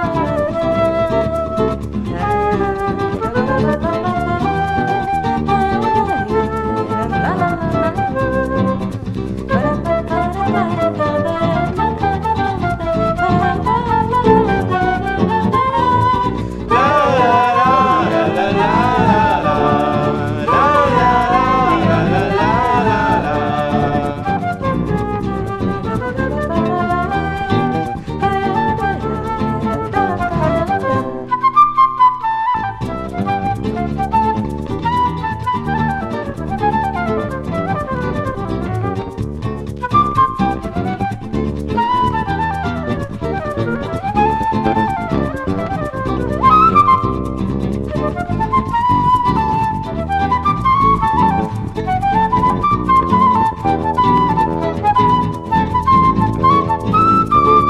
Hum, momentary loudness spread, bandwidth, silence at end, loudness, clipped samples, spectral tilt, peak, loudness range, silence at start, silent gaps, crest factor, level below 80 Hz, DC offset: none; 9 LU; 13 kHz; 0 s; -16 LUFS; under 0.1%; -7.5 dB/octave; 0 dBFS; 5 LU; 0 s; none; 16 dB; -32 dBFS; under 0.1%